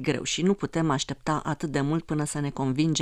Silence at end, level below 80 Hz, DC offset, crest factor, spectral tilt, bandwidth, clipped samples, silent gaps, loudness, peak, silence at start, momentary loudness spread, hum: 0 s; -52 dBFS; under 0.1%; 16 dB; -5 dB/octave; 13.5 kHz; under 0.1%; none; -27 LUFS; -10 dBFS; 0 s; 4 LU; none